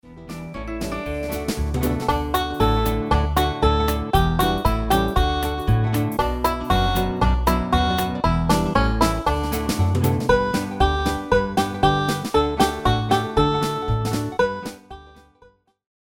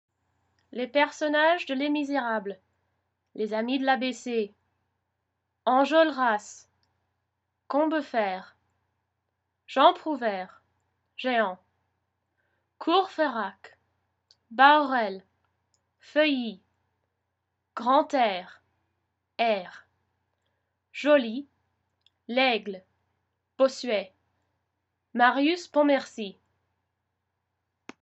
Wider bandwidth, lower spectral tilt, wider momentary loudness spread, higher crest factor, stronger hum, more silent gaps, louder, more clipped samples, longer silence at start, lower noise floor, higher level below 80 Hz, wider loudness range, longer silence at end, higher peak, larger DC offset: first, over 20 kHz vs 8.2 kHz; first, -5.5 dB/octave vs -4 dB/octave; second, 7 LU vs 17 LU; second, 18 dB vs 24 dB; neither; neither; first, -21 LUFS vs -26 LUFS; neither; second, 0.05 s vs 0.75 s; second, -55 dBFS vs -81 dBFS; first, -28 dBFS vs -86 dBFS; second, 2 LU vs 5 LU; second, 0.95 s vs 1.7 s; about the same, -2 dBFS vs -4 dBFS; neither